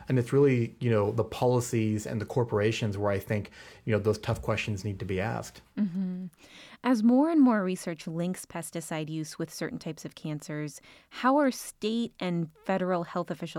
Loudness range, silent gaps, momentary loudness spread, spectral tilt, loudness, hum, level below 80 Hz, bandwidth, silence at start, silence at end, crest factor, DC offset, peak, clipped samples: 4 LU; none; 14 LU; -6.5 dB/octave; -29 LUFS; none; -58 dBFS; 17.5 kHz; 0 s; 0 s; 16 dB; under 0.1%; -14 dBFS; under 0.1%